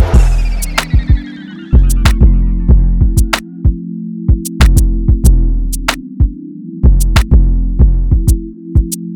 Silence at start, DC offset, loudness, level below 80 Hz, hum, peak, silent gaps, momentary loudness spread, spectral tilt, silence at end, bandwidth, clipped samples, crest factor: 0 s; under 0.1%; -13 LUFS; -10 dBFS; none; 0 dBFS; none; 7 LU; -5.5 dB/octave; 0 s; 16.5 kHz; under 0.1%; 10 dB